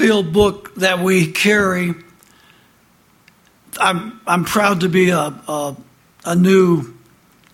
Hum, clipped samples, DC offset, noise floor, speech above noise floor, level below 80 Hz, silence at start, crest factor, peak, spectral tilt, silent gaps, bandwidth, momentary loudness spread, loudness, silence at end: none; under 0.1%; under 0.1%; -54 dBFS; 38 dB; -46 dBFS; 0 s; 18 dB; 0 dBFS; -5 dB/octave; none; 16.5 kHz; 11 LU; -16 LUFS; 0.6 s